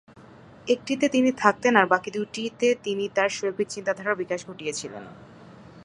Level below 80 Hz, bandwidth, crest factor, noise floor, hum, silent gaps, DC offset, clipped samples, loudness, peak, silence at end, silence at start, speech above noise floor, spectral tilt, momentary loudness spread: -66 dBFS; 11 kHz; 24 dB; -49 dBFS; none; none; under 0.1%; under 0.1%; -24 LUFS; -2 dBFS; 0 s; 0.15 s; 24 dB; -4 dB/octave; 12 LU